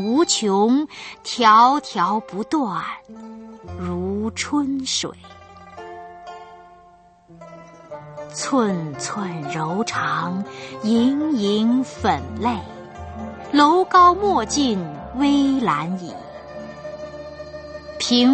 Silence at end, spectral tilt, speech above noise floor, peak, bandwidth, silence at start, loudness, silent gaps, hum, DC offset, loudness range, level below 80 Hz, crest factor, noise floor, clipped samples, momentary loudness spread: 0 s; -4 dB/octave; 31 dB; -2 dBFS; 8.8 kHz; 0 s; -20 LUFS; none; none; under 0.1%; 10 LU; -50 dBFS; 20 dB; -50 dBFS; under 0.1%; 22 LU